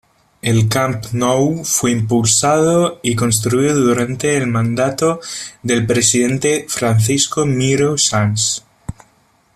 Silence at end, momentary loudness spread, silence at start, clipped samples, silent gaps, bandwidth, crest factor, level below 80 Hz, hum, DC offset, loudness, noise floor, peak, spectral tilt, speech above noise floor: 0.65 s; 6 LU; 0.45 s; under 0.1%; none; 14.5 kHz; 16 dB; -48 dBFS; none; under 0.1%; -15 LUFS; -55 dBFS; 0 dBFS; -4.5 dB/octave; 40 dB